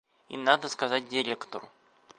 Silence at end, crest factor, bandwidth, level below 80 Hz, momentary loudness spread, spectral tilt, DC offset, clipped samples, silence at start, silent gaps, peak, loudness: 0.5 s; 26 dB; 10.5 kHz; -80 dBFS; 16 LU; -2.5 dB/octave; under 0.1%; under 0.1%; 0.3 s; none; -6 dBFS; -28 LUFS